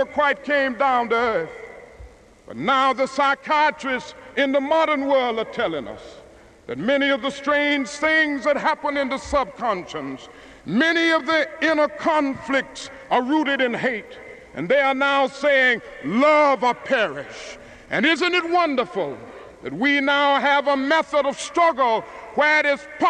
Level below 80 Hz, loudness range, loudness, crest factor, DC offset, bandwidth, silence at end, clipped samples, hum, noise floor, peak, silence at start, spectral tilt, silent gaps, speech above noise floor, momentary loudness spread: -54 dBFS; 3 LU; -20 LUFS; 16 dB; under 0.1%; 10 kHz; 0 s; under 0.1%; none; -47 dBFS; -6 dBFS; 0 s; -4 dB/octave; none; 26 dB; 16 LU